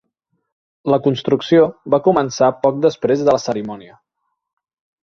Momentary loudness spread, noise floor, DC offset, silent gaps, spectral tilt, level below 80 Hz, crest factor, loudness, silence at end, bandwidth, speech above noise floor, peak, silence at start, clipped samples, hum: 10 LU; -71 dBFS; under 0.1%; none; -6 dB/octave; -56 dBFS; 16 dB; -16 LUFS; 1.2 s; 7.2 kHz; 55 dB; -2 dBFS; 0.85 s; under 0.1%; none